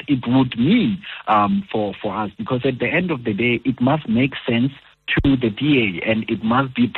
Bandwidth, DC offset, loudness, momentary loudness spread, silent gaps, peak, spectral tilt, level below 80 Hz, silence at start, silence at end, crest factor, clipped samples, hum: 4.3 kHz; under 0.1%; -19 LUFS; 7 LU; none; -6 dBFS; -9.5 dB/octave; -42 dBFS; 0 s; 0 s; 14 dB; under 0.1%; none